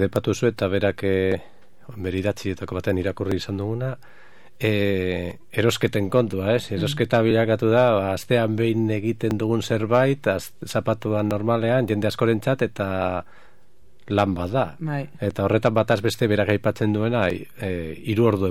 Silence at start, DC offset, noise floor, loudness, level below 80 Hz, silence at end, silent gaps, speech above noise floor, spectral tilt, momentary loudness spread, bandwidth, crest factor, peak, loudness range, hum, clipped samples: 0 s; 0.9%; -59 dBFS; -23 LUFS; -54 dBFS; 0 s; none; 37 dB; -6.5 dB/octave; 9 LU; 15.5 kHz; 20 dB; -2 dBFS; 5 LU; none; under 0.1%